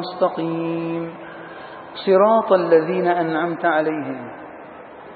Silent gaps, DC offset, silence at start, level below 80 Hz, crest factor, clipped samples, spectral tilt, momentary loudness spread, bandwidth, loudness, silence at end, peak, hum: none; under 0.1%; 0 s; -68 dBFS; 18 dB; under 0.1%; -11 dB/octave; 21 LU; 4.8 kHz; -19 LUFS; 0 s; -2 dBFS; none